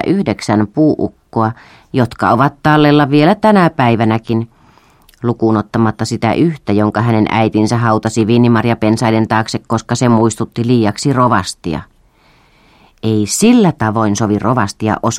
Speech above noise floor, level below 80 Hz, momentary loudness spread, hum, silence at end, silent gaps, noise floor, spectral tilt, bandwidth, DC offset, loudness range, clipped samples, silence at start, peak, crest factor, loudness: 37 dB; -44 dBFS; 9 LU; none; 0 s; none; -50 dBFS; -6 dB/octave; 14.5 kHz; under 0.1%; 3 LU; under 0.1%; 0 s; 0 dBFS; 12 dB; -13 LUFS